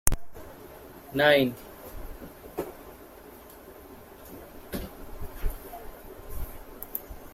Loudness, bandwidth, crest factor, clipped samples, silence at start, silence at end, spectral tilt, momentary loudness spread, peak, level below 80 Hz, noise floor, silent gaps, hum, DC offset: -30 LUFS; 16.5 kHz; 30 dB; under 0.1%; 0.05 s; 0 s; -3.5 dB/octave; 24 LU; -2 dBFS; -40 dBFS; -48 dBFS; none; none; under 0.1%